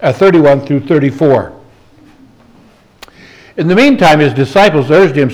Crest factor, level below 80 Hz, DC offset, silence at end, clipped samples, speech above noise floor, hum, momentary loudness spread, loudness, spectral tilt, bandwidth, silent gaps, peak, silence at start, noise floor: 10 dB; -44 dBFS; under 0.1%; 0 s; under 0.1%; 36 dB; none; 7 LU; -9 LUFS; -7 dB/octave; 19 kHz; none; 0 dBFS; 0 s; -44 dBFS